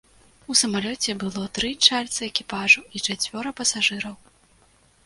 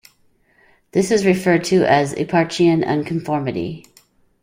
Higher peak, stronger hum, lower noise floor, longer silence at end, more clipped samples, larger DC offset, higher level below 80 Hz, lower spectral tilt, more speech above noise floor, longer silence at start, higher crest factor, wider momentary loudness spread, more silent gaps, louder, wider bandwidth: about the same, 0 dBFS vs -2 dBFS; neither; about the same, -58 dBFS vs -58 dBFS; first, 0.9 s vs 0.65 s; neither; neither; about the same, -56 dBFS vs -54 dBFS; second, -1 dB/octave vs -6 dB/octave; second, 35 dB vs 41 dB; second, 0.5 s vs 0.95 s; first, 24 dB vs 16 dB; about the same, 10 LU vs 9 LU; neither; second, -21 LUFS vs -18 LUFS; second, 11.5 kHz vs 16 kHz